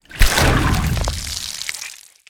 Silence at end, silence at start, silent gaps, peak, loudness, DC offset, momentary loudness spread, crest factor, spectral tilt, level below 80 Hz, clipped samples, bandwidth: 0.3 s; 0.1 s; none; 0 dBFS; -19 LUFS; under 0.1%; 12 LU; 18 dB; -3.5 dB/octave; -22 dBFS; under 0.1%; over 20 kHz